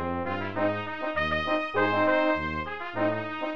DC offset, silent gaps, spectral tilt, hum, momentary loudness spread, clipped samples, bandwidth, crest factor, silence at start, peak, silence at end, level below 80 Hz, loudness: 0.6%; none; -7 dB/octave; none; 8 LU; under 0.1%; 7.2 kHz; 16 dB; 0 s; -12 dBFS; 0 s; -50 dBFS; -27 LUFS